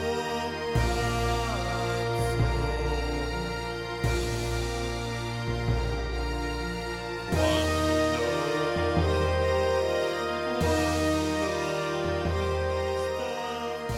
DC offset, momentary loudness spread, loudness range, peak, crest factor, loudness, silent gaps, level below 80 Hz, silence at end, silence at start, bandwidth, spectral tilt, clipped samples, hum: under 0.1%; 6 LU; 4 LU; -12 dBFS; 16 dB; -28 LUFS; none; -36 dBFS; 0 s; 0 s; 16 kHz; -5.5 dB/octave; under 0.1%; none